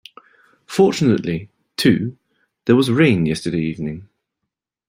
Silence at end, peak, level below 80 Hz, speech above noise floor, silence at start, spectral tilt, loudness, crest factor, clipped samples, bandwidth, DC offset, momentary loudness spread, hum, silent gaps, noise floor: 0.85 s; -2 dBFS; -52 dBFS; 64 dB; 0.7 s; -6.5 dB/octave; -18 LUFS; 18 dB; under 0.1%; 16 kHz; under 0.1%; 14 LU; none; none; -80 dBFS